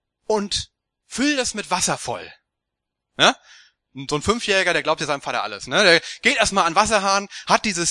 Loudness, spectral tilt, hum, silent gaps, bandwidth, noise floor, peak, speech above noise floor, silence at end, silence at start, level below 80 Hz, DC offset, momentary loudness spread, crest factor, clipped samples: -19 LUFS; -2 dB/octave; none; none; 12 kHz; -82 dBFS; 0 dBFS; 62 dB; 0 s; 0.3 s; -50 dBFS; under 0.1%; 12 LU; 22 dB; under 0.1%